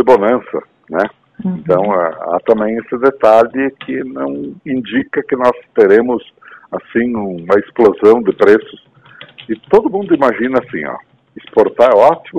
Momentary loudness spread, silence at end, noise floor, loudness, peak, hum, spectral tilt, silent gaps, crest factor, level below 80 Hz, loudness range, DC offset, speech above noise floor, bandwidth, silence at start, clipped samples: 13 LU; 0 s; -40 dBFS; -13 LUFS; 0 dBFS; none; -7.5 dB/octave; none; 14 dB; -52 dBFS; 3 LU; under 0.1%; 27 dB; 7.8 kHz; 0 s; 0.9%